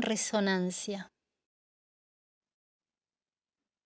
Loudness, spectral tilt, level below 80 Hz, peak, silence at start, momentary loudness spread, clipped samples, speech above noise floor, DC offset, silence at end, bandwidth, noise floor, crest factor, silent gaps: -32 LUFS; -4 dB/octave; -80 dBFS; -18 dBFS; 0 s; 13 LU; under 0.1%; over 58 dB; under 0.1%; 2.8 s; 8 kHz; under -90 dBFS; 20 dB; none